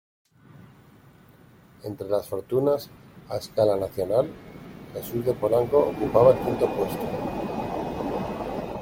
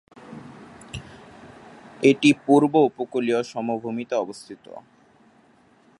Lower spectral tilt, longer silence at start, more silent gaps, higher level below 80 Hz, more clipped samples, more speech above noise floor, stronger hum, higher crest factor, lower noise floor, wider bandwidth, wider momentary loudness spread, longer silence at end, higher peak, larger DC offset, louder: first, -7 dB/octave vs -5.5 dB/octave; first, 0.55 s vs 0.3 s; neither; first, -52 dBFS vs -60 dBFS; neither; second, 29 dB vs 36 dB; neither; about the same, 22 dB vs 22 dB; second, -53 dBFS vs -57 dBFS; first, 16.5 kHz vs 11.5 kHz; second, 17 LU vs 25 LU; second, 0 s vs 1.2 s; about the same, -4 dBFS vs -2 dBFS; neither; second, -25 LUFS vs -21 LUFS